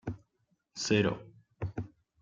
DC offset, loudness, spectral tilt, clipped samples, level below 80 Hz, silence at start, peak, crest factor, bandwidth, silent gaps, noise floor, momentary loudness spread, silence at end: under 0.1%; -33 LUFS; -5 dB/octave; under 0.1%; -60 dBFS; 0.05 s; -14 dBFS; 22 dB; 9.4 kHz; none; -77 dBFS; 20 LU; 0.35 s